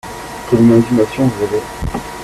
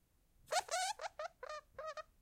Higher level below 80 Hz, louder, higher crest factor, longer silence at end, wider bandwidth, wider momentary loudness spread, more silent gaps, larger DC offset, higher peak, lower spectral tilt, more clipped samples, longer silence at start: first, -34 dBFS vs -74 dBFS; first, -14 LUFS vs -43 LUFS; second, 14 dB vs 24 dB; second, 0 s vs 0.2 s; second, 14 kHz vs 16.5 kHz; first, 14 LU vs 11 LU; neither; neither; first, -2 dBFS vs -22 dBFS; first, -7 dB/octave vs 1 dB/octave; neither; second, 0.05 s vs 0.5 s